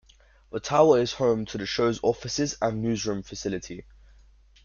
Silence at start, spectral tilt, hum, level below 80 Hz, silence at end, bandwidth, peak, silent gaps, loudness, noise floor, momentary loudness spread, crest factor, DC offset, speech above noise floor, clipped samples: 0.55 s; -5 dB/octave; none; -54 dBFS; 0.85 s; 7.4 kHz; -6 dBFS; none; -25 LUFS; -55 dBFS; 15 LU; 20 dB; under 0.1%; 30 dB; under 0.1%